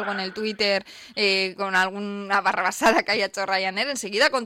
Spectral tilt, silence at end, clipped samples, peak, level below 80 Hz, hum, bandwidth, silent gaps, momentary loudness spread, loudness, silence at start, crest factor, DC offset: -2.5 dB/octave; 0 s; under 0.1%; -8 dBFS; -62 dBFS; none; 16.5 kHz; none; 7 LU; -23 LUFS; 0 s; 16 dB; under 0.1%